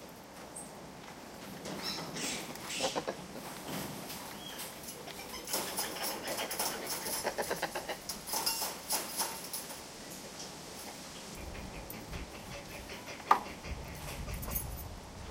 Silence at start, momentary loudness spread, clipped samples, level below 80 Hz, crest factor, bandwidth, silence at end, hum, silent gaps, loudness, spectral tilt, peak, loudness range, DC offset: 0 s; 12 LU; under 0.1%; -54 dBFS; 30 dB; 17 kHz; 0 s; none; none; -38 LUFS; -2 dB/octave; -8 dBFS; 6 LU; under 0.1%